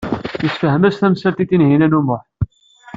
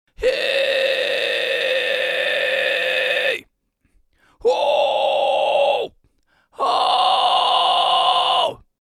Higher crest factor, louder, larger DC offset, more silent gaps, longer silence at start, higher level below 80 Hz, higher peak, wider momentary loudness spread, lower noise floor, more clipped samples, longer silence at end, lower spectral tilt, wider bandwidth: about the same, 14 dB vs 16 dB; about the same, -16 LUFS vs -18 LUFS; neither; neither; second, 0 s vs 0.2 s; first, -42 dBFS vs -54 dBFS; about the same, -2 dBFS vs -4 dBFS; first, 12 LU vs 6 LU; second, -41 dBFS vs -65 dBFS; neither; first, 0.5 s vs 0.25 s; first, -9 dB/octave vs -1 dB/octave; second, 7.6 kHz vs 15.5 kHz